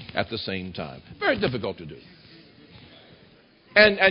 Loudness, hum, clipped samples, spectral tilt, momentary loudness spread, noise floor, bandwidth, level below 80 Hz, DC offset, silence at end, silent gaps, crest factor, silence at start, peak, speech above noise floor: -23 LUFS; none; under 0.1%; -9 dB/octave; 22 LU; -55 dBFS; 5.4 kHz; -54 dBFS; under 0.1%; 0 s; none; 22 dB; 0 s; -4 dBFS; 31 dB